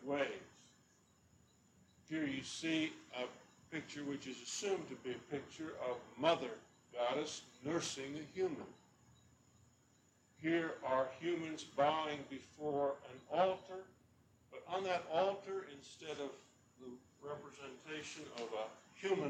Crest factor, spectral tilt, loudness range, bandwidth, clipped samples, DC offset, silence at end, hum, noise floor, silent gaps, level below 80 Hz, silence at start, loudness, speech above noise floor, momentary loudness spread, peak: 22 dB; -4 dB/octave; 5 LU; 12.5 kHz; under 0.1%; under 0.1%; 0 s; none; -72 dBFS; none; -80 dBFS; 0 s; -42 LUFS; 31 dB; 16 LU; -20 dBFS